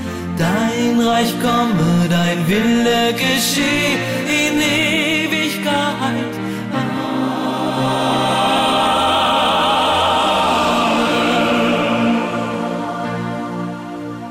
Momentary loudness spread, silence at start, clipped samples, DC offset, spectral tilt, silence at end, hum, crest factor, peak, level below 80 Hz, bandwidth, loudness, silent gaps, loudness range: 8 LU; 0 s; under 0.1%; under 0.1%; -4.5 dB/octave; 0 s; none; 10 dB; -6 dBFS; -46 dBFS; 16 kHz; -16 LUFS; none; 4 LU